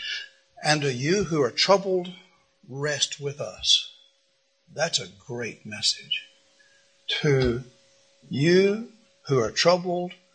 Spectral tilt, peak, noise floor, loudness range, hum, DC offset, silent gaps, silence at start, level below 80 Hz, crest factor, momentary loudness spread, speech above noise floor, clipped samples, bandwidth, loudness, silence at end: -4 dB/octave; -4 dBFS; -69 dBFS; 4 LU; none; under 0.1%; none; 0 s; -52 dBFS; 22 dB; 16 LU; 44 dB; under 0.1%; 10 kHz; -24 LUFS; 0.2 s